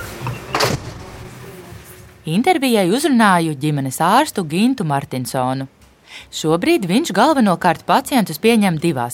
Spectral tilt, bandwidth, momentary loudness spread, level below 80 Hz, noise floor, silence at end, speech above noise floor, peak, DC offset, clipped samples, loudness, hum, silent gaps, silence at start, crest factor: -5 dB/octave; 17 kHz; 20 LU; -48 dBFS; -40 dBFS; 0 s; 24 dB; 0 dBFS; under 0.1%; under 0.1%; -17 LUFS; none; none; 0 s; 16 dB